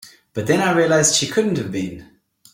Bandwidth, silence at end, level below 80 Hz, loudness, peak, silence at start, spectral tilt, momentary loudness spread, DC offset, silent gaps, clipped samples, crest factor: 16.5 kHz; 0.5 s; -56 dBFS; -18 LUFS; -2 dBFS; 0.05 s; -3.5 dB/octave; 13 LU; under 0.1%; none; under 0.1%; 18 dB